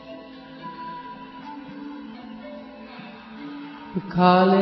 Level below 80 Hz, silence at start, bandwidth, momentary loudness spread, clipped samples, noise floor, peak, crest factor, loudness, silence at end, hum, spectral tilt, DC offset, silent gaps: -60 dBFS; 0.1 s; 5.8 kHz; 22 LU; under 0.1%; -41 dBFS; -4 dBFS; 22 dB; -22 LUFS; 0 s; none; -9.5 dB/octave; under 0.1%; none